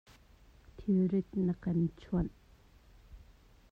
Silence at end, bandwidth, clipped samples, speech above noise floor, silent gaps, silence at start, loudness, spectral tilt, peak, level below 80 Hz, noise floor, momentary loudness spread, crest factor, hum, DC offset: 0.55 s; 5 kHz; under 0.1%; 29 dB; none; 0.8 s; -34 LUFS; -10.5 dB/octave; -20 dBFS; -52 dBFS; -61 dBFS; 7 LU; 14 dB; none; under 0.1%